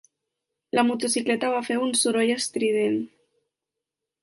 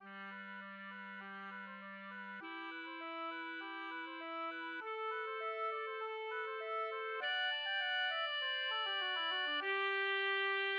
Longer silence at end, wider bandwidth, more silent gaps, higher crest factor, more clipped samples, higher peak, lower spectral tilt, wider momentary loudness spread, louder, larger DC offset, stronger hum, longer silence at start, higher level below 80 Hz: first, 1.15 s vs 0 s; first, 11.5 kHz vs 6.8 kHz; neither; about the same, 18 dB vs 14 dB; neither; first, -8 dBFS vs -28 dBFS; first, -2.5 dB/octave vs 2 dB/octave; second, 5 LU vs 13 LU; first, -24 LUFS vs -40 LUFS; neither; neither; first, 0.75 s vs 0 s; first, -74 dBFS vs under -90 dBFS